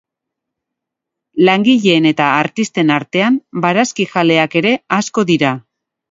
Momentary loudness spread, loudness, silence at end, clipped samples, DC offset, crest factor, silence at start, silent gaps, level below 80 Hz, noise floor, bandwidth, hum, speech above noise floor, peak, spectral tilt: 5 LU; -13 LUFS; 0.5 s; under 0.1%; under 0.1%; 14 dB; 1.35 s; none; -60 dBFS; -81 dBFS; 7.8 kHz; none; 67 dB; 0 dBFS; -5 dB/octave